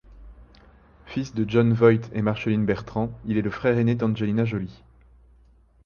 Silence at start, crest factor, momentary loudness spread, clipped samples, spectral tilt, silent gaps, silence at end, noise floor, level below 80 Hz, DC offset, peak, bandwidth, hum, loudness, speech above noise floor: 0.1 s; 20 dB; 12 LU; under 0.1%; -8.5 dB/octave; none; 1.15 s; -56 dBFS; -50 dBFS; under 0.1%; -6 dBFS; 6.8 kHz; none; -24 LUFS; 34 dB